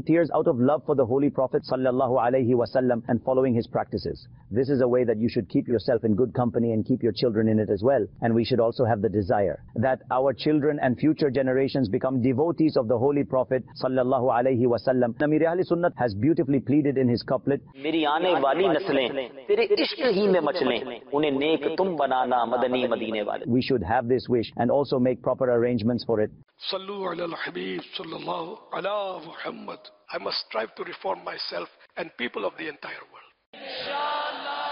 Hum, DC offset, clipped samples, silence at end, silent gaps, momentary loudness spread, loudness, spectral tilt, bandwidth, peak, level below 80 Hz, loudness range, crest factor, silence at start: none; under 0.1%; under 0.1%; 0 s; 33.46-33.53 s; 10 LU; -25 LUFS; -5 dB/octave; 5.6 kHz; -12 dBFS; -58 dBFS; 8 LU; 14 dB; 0 s